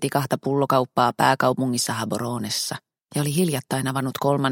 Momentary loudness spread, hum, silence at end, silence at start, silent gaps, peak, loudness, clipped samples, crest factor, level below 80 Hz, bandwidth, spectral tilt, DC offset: 8 LU; none; 0 s; 0 s; none; -2 dBFS; -23 LUFS; under 0.1%; 20 dB; -62 dBFS; 17 kHz; -4.5 dB/octave; under 0.1%